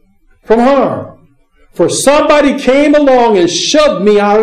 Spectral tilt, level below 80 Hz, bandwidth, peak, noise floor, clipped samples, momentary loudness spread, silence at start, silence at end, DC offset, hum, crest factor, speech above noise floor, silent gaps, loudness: -4 dB/octave; -40 dBFS; 14.5 kHz; 0 dBFS; -47 dBFS; under 0.1%; 7 LU; 0.45 s; 0 s; under 0.1%; none; 10 dB; 38 dB; none; -9 LUFS